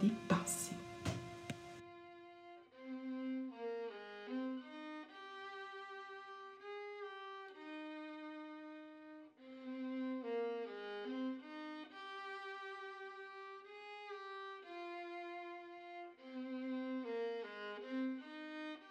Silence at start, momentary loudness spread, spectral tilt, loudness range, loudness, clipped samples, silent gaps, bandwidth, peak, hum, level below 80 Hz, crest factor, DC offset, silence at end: 0 s; 11 LU; -4.5 dB/octave; 5 LU; -46 LUFS; under 0.1%; none; 15.5 kHz; -22 dBFS; none; -78 dBFS; 24 dB; under 0.1%; 0 s